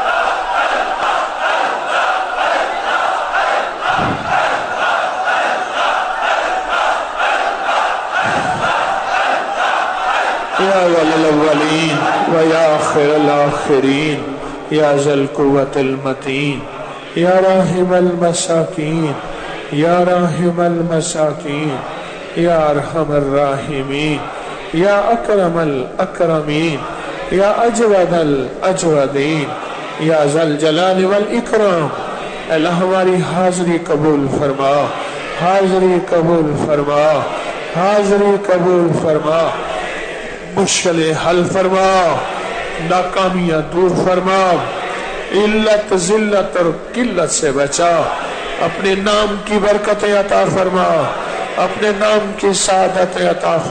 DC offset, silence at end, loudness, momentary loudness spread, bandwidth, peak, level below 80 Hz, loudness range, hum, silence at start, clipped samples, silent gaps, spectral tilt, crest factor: under 0.1%; 0 s; -15 LUFS; 8 LU; 9.4 kHz; -4 dBFS; -42 dBFS; 2 LU; none; 0 s; under 0.1%; none; -4.5 dB/octave; 12 dB